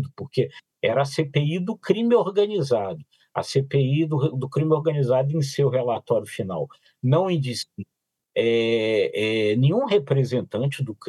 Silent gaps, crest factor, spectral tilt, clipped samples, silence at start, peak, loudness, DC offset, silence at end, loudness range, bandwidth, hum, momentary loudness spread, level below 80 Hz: none; 18 dB; -7 dB/octave; under 0.1%; 0 s; -6 dBFS; -23 LUFS; under 0.1%; 0 s; 2 LU; 12.5 kHz; none; 10 LU; -74 dBFS